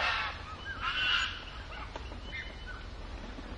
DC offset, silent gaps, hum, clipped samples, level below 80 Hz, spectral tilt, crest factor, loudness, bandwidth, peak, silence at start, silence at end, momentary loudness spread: under 0.1%; none; none; under 0.1%; -46 dBFS; -3 dB/octave; 20 dB; -35 LUFS; 11 kHz; -18 dBFS; 0 s; 0 s; 16 LU